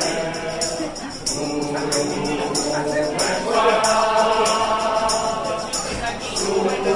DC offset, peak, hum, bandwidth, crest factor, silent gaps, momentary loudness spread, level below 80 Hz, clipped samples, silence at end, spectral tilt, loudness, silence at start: under 0.1%; -4 dBFS; none; 11.5 kHz; 16 dB; none; 7 LU; -44 dBFS; under 0.1%; 0 s; -3 dB/octave; -21 LUFS; 0 s